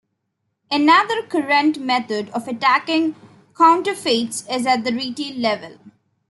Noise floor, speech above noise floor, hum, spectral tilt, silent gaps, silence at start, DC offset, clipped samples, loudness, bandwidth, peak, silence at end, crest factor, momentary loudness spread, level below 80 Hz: -74 dBFS; 56 dB; none; -3 dB/octave; none; 0.7 s; under 0.1%; under 0.1%; -19 LUFS; 12 kHz; -2 dBFS; 0.4 s; 18 dB; 11 LU; -70 dBFS